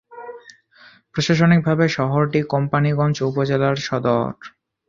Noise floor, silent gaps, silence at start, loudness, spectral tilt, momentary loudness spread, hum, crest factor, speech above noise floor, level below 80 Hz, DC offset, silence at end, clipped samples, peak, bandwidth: -50 dBFS; none; 0.1 s; -19 LUFS; -6.5 dB/octave; 16 LU; none; 18 dB; 32 dB; -54 dBFS; under 0.1%; 0.4 s; under 0.1%; -2 dBFS; 7.4 kHz